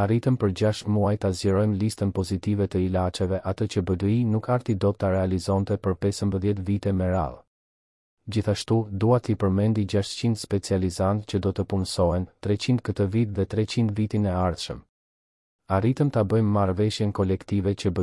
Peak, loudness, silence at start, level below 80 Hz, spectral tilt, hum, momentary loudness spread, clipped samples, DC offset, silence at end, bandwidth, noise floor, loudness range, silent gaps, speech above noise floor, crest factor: -8 dBFS; -25 LUFS; 0 s; -52 dBFS; -7 dB/octave; none; 5 LU; under 0.1%; under 0.1%; 0 s; 12 kHz; under -90 dBFS; 2 LU; 7.47-8.17 s, 14.89-15.59 s; over 66 dB; 16 dB